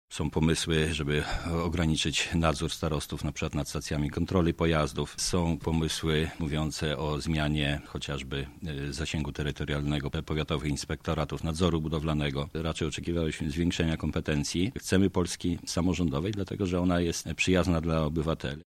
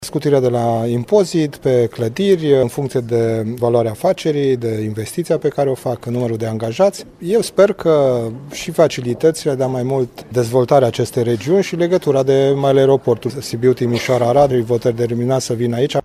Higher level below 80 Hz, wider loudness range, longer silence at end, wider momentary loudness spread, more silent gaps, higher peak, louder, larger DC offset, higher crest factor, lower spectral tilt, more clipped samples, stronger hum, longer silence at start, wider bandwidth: first, -42 dBFS vs -50 dBFS; about the same, 3 LU vs 3 LU; about the same, 0.05 s vs 0.05 s; about the same, 6 LU vs 8 LU; neither; second, -8 dBFS vs 0 dBFS; second, -30 LUFS vs -16 LUFS; neither; about the same, 20 dB vs 16 dB; second, -5 dB/octave vs -6.5 dB/octave; neither; neither; about the same, 0.1 s vs 0 s; about the same, 15 kHz vs 15.5 kHz